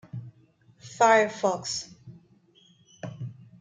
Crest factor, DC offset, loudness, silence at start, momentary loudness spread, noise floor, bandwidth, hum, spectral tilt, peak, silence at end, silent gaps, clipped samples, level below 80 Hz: 22 dB; under 0.1%; -24 LUFS; 0.15 s; 23 LU; -60 dBFS; 9.6 kHz; none; -3.5 dB/octave; -8 dBFS; 0.3 s; none; under 0.1%; -72 dBFS